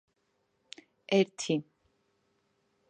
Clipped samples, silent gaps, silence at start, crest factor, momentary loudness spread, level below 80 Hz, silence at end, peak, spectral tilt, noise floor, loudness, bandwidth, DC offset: under 0.1%; none; 1.1 s; 24 dB; 23 LU; -82 dBFS; 1.3 s; -12 dBFS; -5 dB/octave; -77 dBFS; -30 LUFS; 9.8 kHz; under 0.1%